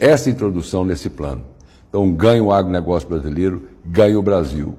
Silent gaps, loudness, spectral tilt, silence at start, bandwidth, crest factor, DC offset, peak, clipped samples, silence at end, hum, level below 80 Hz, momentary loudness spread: none; -17 LUFS; -7 dB/octave; 0 s; 15 kHz; 14 dB; under 0.1%; -2 dBFS; under 0.1%; 0.05 s; none; -36 dBFS; 12 LU